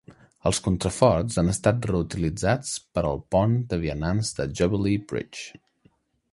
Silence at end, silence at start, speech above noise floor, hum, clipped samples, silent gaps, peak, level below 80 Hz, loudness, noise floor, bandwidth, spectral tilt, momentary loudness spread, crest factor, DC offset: 0.85 s; 0.1 s; 39 dB; none; under 0.1%; none; -4 dBFS; -42 dBFS; -25 LUFS; -63 dBFS; 11.5 kHz; -5.5 dB/octave; 8 LU; 22 dB; under 0.1%